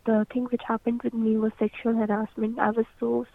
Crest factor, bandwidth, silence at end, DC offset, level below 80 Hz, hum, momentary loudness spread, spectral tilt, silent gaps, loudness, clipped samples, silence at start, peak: 20 dB; 3.9 kHz; 0.1 s; under 0.1%; -60 dBFS; none; 3 LU; -9 dB/octave; none; -27 LUFS; under 0.1%; 0.05 s; -6 dBFS